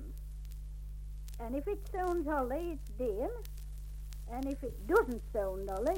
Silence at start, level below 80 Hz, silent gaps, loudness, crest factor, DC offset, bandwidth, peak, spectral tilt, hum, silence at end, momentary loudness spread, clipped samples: 0 s; -44 dBFS; none; -38 LUFS; 20 dB; under 0.1%; 17 kHz; -16 dBFS; -7 dB/octave; 50 Hz at -45 dBFS; 0 s; 16 LU; under 0.1%